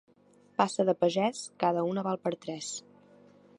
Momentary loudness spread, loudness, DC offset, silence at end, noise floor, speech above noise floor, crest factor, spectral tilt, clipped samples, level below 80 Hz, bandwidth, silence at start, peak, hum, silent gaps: 10 LU; -30 LUFS; under 0.1%; 0.8 s; -62 dBFS; 32 dB; 22 dB; -5 dB/octave; under 0.1%; -80 dBFS; 11 kHz; 0.6 s; -10 dBFS; none; none